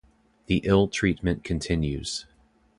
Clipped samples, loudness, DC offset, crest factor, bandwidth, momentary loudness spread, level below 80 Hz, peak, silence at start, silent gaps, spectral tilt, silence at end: under 0.1%; -26 LUFS; under 0.1%; 20 dB; 11.5 kHz; 10 LU; -40 dBFS; -8 dBFS; 0.5 s; none; -5.5 dB/octave; 0.55 s